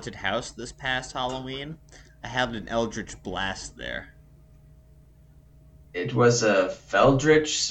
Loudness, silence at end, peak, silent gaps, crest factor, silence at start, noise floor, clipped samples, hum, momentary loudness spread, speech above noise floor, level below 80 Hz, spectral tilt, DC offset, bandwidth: -25 LUFS; 0 s; -6 dBFS; none; 20 dB; 0 s; -53 dBFS; under 0.1%; none; 16 LU; 28 dB; -48 dBFS; -4 dB/octave; under 0.1%; 9 kHz